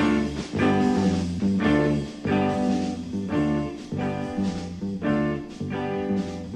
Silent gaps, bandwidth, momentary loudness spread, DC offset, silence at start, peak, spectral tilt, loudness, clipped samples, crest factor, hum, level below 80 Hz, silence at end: none; 10.5 kHz; 9 LU; under 0.1%; 0 s; -10 dBFS; -7 dB/octave; -25 LUFS; under 0.1%; 16 dB; none; -46 dBFS; 0 s